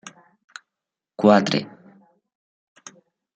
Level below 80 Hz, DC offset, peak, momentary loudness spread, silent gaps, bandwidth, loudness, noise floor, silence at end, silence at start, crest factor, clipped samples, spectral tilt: -70 dBFS; under 0.1%; -2 dBFS; 28 LU; none; 8 kHz; -19 LUFS; -87 dBFS; 1.7 s; 1.2 s; 24 dB; under 0.1%; -5.5 dB/octave